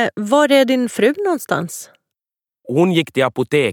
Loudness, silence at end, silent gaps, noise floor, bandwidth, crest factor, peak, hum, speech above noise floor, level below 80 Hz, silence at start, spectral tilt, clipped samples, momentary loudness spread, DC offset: -16 LUFS; 0 s; none; under -90 dBFS; 18.5 kHz; 16 dB; 0 dBFS; none; over 74 dB; -66 dBFS; 0 s; -5 dB/octave; under 0.1%; 9 LU; under 0.1%